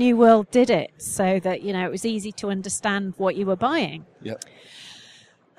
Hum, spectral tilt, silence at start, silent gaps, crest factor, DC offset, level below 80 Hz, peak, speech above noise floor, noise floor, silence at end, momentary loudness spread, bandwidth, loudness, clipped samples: none; -5 dB/octave; 0 s; none; 18 dB; under 0.1%; -62 dBFS; -4 dBFS; 31 dB; -53 dBFS; 0.6 s; 21 LU; 14.5 kHz; -22 LUFS; under 0.1%